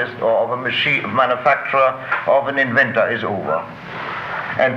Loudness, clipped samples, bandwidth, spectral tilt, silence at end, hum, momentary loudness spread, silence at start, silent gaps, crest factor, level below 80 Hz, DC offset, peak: -18 LUFS; under 0.1%; 7.4 kHz; -6 dB/octave; 0 s; none; 10 LU; 0 s; none; 14 dB; -58 dBFS; under 0.1%; -4 dBFS